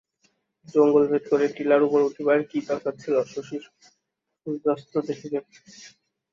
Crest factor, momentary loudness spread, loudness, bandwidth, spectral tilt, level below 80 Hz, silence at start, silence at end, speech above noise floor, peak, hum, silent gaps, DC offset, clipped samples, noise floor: 18 dB; 14 LU; -24 LUFS; 7.4 kHz; -6.5 dB/octave; -72 dBFS; 0.75 s; 0.45 s; 57 dB; -8 dBFS; none; none; under 0.1%; under 0.1%; -80 dBFS